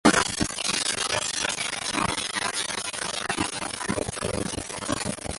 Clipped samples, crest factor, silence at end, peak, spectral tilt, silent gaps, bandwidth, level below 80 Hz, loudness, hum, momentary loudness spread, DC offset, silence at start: under 0.1%; 22 dB; 0 s; -4 dBFS; -2.5 dB/octave; none; 12 kHz; -48 dBFS; -26 LUFS; none; 5 LU; under 0.1%; 0.05 s